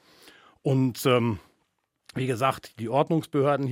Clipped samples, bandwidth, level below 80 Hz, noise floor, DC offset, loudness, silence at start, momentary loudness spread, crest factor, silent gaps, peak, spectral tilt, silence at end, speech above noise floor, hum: under 0.1%; 16.5 kHz; -64 dBFS; -74 dBFS; under 0.1%; -26 LUFS; 0.65 s; 10 LU; 20 dB; none; -8 dBFS; -6.5 dB/octave; 0 s; 50 dB; none